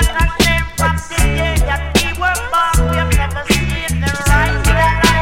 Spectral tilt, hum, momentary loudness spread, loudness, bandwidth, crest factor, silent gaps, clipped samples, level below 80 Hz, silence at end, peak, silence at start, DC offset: -4 dB/octave; none; 4 LU; -15 LUFS; 17 kHz; 14 dB; none; under 0.1%; -18 dBFS; 0 s; 0 dBFS; 0 s; under 0.1%